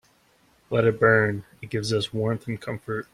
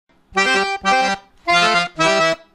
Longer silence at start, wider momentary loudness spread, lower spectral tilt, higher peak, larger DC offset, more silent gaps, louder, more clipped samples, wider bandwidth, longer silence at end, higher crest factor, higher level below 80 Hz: first, 0.7 s vs 0.35 s; first, 13 LU vs 7 LU; first, -6 dB/octave vs -2.5 dB/octave; about the same, -4 dBFS vs -2 dBFS; neither; neither; second, -24 LUFS vs -16 LUFS; neither; second, 13 kHz vs 15 kHz; about the same, 0.1 s vs 0.2 s; first, 22 dB vs 16 dB; second, -58 dBFS vs -52 dBFS